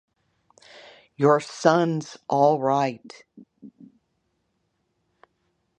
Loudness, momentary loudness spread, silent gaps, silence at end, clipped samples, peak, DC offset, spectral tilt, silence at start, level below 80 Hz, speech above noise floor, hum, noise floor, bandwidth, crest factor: -22 LUFS; 9 LU; none; 2.1 s; under 0.1%; -2 dBFS; under 0.1%; -6 dB/octave; 1.2 s; -74 dBFS; 51 dB; none; -74 dBFS; 10 kHz; 24 dB